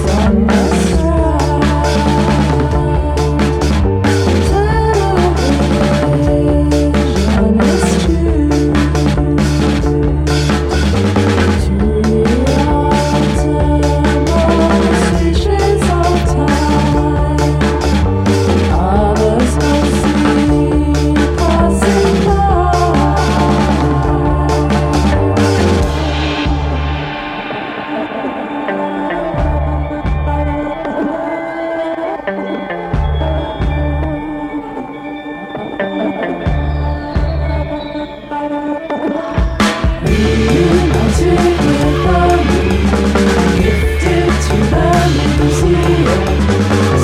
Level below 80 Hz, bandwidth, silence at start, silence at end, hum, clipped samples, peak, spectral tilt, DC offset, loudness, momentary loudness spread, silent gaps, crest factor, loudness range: -18 dBFS; 13 kHz; 0 s; 0 s; none; under 0.1%; 0 dBFS; -6.5 dB/octave; under 0.1%; -13 LUFS; 8 LU; none; 12 dB; 7 LU